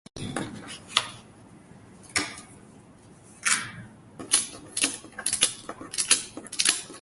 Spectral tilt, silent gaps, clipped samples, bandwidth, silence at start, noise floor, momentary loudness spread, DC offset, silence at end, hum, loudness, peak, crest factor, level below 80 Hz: 0 dB/octave; none; under 0.1%; 12 kHz; 0.15 s; -52 dBFS; 17 LU; under 0.1%; 0 s; none; -26 LUFS; 0 dBFS; 30 dB; -62 dBFS